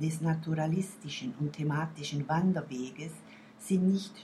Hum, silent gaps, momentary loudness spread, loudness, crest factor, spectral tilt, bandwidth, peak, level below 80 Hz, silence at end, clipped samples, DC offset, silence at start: none; none; 15 LU; -32 LUFS; 14 dB; -6.5 dB/octave; 13.5 kHz; -18 dBFS; -70 dBFS; 0 s; under 0.1%; under 0.1%; 0 s